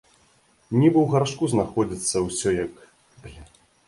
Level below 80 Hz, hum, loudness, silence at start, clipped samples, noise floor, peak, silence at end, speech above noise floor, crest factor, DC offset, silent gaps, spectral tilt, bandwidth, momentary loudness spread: -50 dBFS; none; -23 LUFS; 0.7 s; under 0.1%; -60 dBFS; -6 dBFS; 0.45 s; 39 dB; 18 dB; under 0.1%; none; -5.5 dB/octave; 11.5 kHz; 8 LU